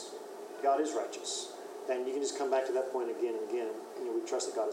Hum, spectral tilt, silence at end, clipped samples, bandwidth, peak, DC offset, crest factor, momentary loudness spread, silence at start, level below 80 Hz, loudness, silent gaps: none; -1.5 dB/octave; 0 s; under 0.1%; 16 kHz; -18 dBFS; under 0.1%; 16 dB; 11 LU; 0 s; under -90 dBFS; -35 LUFS; none